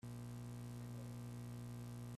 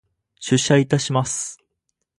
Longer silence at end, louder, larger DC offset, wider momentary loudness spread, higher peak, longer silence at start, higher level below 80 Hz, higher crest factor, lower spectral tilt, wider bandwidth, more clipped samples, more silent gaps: second, 0 s vs 0.65 s; second, -51 LUFS vs -20 LUFS; neither; second, 0 LU vs 13 LU; second, -42 dBFS vs -2 dBFS; second, 0.05 s vs 0.4 s; second, -66 dBFS vs -56 dBFS; second, 8 dB vs 20 dB; first, -6.5 dB/octave vs -4.5 dB/octave; first, 14.5 kHz vs 11.5 kHz; neither; neither